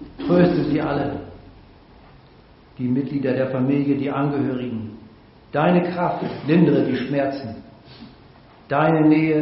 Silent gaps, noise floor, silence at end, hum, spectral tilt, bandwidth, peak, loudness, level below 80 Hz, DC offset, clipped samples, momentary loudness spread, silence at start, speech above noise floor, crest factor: none; -49 dBFS; 0 s; none; -7 dB/octave; 5.8 kHz; -4 dBFS; -21 LUFS; -52 dBFS; under 0.1%; under 0.1%; 14 LU; 0 s; 30 dB; 18 dB